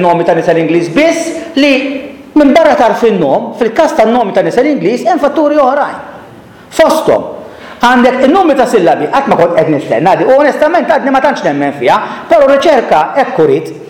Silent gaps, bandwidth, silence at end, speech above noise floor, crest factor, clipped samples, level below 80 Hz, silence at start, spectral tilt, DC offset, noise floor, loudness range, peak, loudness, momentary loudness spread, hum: none; 17.5 kHz; 0 s; 25 dB; 8 dB; under 0.1%; -46 dBFS; 0 s; -5.5 dB/octave; 0.2%; -33 dBFS; 2 LU; 0 dBFS; -9 LUFS; 7 LU; none